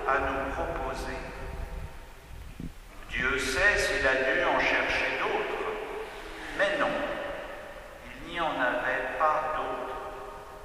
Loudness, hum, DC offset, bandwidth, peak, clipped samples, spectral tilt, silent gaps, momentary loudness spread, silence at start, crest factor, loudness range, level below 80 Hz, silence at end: -28 LUFS; none; under 0.1%; 15.5 kHz; -10 dBFS; under 0.1%; -3.5 dB/octave; none; 19 LU; 0 s; 20 dB; 6 LU; -44 dBFS; 0 s